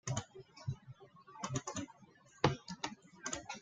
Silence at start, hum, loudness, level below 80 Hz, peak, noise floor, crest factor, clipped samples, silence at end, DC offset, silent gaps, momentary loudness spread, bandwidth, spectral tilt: 0.05 s; none; -42 LUFS; -66 dBFS; -12 dBFS; -63 dBFS; 30 dB; under 0.1%; 0 s; under 0.1%; none; 22 LU; 9.6 kHz; -4.5 dB/octave